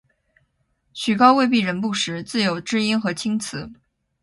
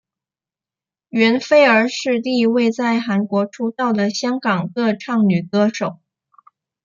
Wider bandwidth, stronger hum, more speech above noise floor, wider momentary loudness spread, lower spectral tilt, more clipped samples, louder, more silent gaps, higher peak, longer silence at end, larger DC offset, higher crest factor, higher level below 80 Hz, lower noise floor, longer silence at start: first, 11.5 kHz vs 7.4 kHz; neither; second, 48 dB vs 73 dB; first, 16 LU vs 8 LU; about the same, -4.5 dB/octave vs -5.5 dB/octave; neither; second, -20 LUFS vs -17 LUFS; neither; about the same, -2 dBFS vs -2 dBFS; second, 0.5 s vs 0.9 s; neither; about the same, 20 dB vs 16 dB; first, -60 dBFS vs -68 dBFS; second, -68 dBFS vs -90 dBFS; second, 0.95 s vs 1.15 s